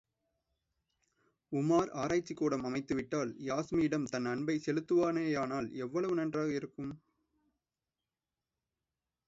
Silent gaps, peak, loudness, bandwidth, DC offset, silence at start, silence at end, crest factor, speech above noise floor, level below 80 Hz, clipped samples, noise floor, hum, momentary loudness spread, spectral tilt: none; -18 dBFS; -34 LUFS; 7.8 kHz; under 0.1%; 1.5 s; 2.3 s; 18 dB; over 56 dB; -68 dBFS; under 0.1%; under -90 dBFS; none; 8 LU; -6.5 dB/octave